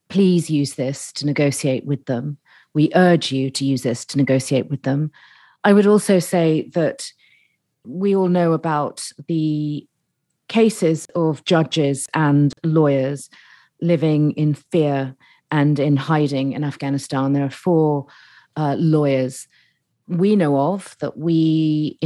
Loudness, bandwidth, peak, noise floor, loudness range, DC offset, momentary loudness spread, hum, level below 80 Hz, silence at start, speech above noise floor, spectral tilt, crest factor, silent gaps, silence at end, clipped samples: -19 LUFS; 12.5 kHz; -2 dBFS; -73 dBFS; 3 LU; under 0.1%; 10 LU; none; -72 dBFS; 0.1 s; 55 dB; -6.5 dB/octave; 18 dB; none; 0 s; under 0.1%